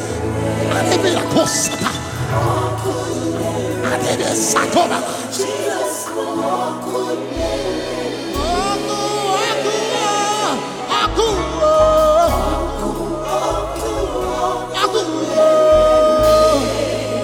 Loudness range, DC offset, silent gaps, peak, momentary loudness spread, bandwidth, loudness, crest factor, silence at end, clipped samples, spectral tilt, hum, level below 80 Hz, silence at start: 5 LU; under 0.1%; none; -2 dBFS; 10 LU; 17.5 kHz; -17 LUFS; 16 dB; 0 s; under 0.1%; -4 dB/octave; none; -34 dBFS; 0 s